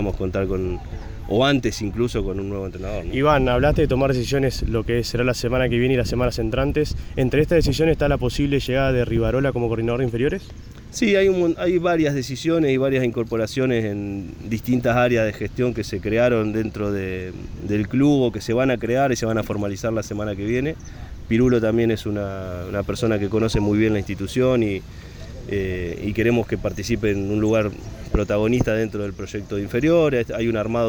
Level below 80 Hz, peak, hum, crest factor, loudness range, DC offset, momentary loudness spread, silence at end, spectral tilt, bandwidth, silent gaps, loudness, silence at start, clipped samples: -34 dBFS; -6 dBFS; none; 16 dB; 3 LU; under 0.1%; 10 LU; 0 s; -6.5 dB/octave; over 20 kHz; none; -21 LUFS; 0 s; under 0.1%